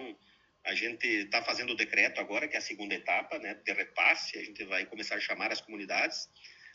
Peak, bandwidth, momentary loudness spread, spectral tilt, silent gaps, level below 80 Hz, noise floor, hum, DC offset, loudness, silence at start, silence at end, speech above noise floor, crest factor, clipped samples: -10 dBFS; 8 kHz; 12 LU; -1.5 dB/octave; none; -80 dBFS; -66 dBFS; none; under 0.1%; -31 LUFS; 0 s; 0 s; 33 dB; 24 dB; under 0.1%